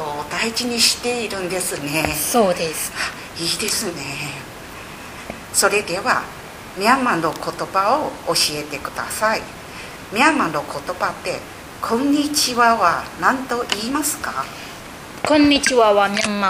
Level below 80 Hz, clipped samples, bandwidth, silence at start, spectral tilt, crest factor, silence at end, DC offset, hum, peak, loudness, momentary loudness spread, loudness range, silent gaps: -48 dBFS; under 0.1%; 16 kHz; 0 s; -2.5 dB/octave; 20 dB; 0 s; under 0.1%; none; 0 dBFS; -19 LUFS; 18 LU; 3 LU; none